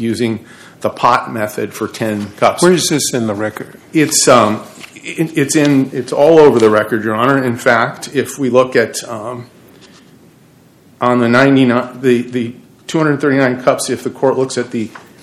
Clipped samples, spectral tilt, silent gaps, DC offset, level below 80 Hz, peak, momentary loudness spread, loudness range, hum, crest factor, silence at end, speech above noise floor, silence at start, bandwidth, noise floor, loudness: 0.6%; -4.5 dB/octave; none; under 0.1%; -56 dBFS; 0 dBFS; 14 LU; 4 LU; none; 14 dB; 0.25 s; 33 dB; 0 s; 15 kHz; -46 dBFS; -13 LUFS